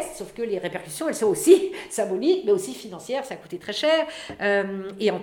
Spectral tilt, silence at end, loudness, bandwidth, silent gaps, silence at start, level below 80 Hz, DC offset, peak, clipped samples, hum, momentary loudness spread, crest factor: -4 dB/octave; 0 s; -24 LUFS; 17.5 kHz; none; 0 s; -62 dBFS; under 0.1%; -2 dBFS; under 0.1%; none; 14 LU; 22 dB